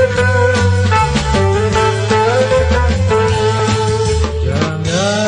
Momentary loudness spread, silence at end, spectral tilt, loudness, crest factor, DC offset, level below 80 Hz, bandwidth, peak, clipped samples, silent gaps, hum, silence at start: 4 LU; 0 s; -5.5 dB/octave; -13 LUFS; 12 dB; under 0.1%; -24 dBFS; 10 kHz; -2 dBFS; under 0.1%; none; none; 0 s